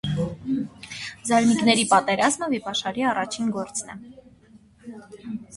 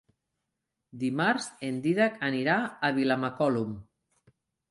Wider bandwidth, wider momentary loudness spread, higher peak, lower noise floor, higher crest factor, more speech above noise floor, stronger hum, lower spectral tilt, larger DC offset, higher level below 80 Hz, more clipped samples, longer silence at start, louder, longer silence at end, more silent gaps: about the same, 11.5 kHz vs 11.5 kHz; first, 21 LU vs 8 LU; first, -4 dBFS vs -12 dBFS; second, -53 dBFS vs -84 dBFS; about the same, 20 dB vs 16 dB; second, 29 dB vs 56 dB; neither; second, -4 dB/octave vs -5.5 dB/octave; neither; first, -56 dBFS vs -68 dBFS; neither; second, 0.05 s vs 0.95 s; first, -23 LUFS vs -28 LUFS; second, 0 s vs 0.85 s; neither